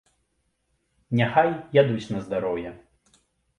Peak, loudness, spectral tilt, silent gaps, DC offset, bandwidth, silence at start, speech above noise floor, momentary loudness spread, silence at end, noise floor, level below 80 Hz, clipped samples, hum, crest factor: -4 dBFS; -24 LUFS; -7.5 dB/octave; none; under 0.1%; 11 kHz; 1.1 s; 50 dB; 9 LU; 0.8 s; -73 dBFS; -60 dBFS; under 0.1%; none; 22 dB